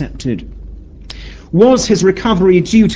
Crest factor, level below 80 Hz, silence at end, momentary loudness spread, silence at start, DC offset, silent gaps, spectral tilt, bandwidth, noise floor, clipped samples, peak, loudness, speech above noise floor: 12 dB; -32 dBFS; 0 s; 22 LU; 0 s; under 0.1%; none; -6 dB/octave; 8 kHz; -31 dBFS; under 0.1%; 0 dBFS; -12 LUFS; 20 dB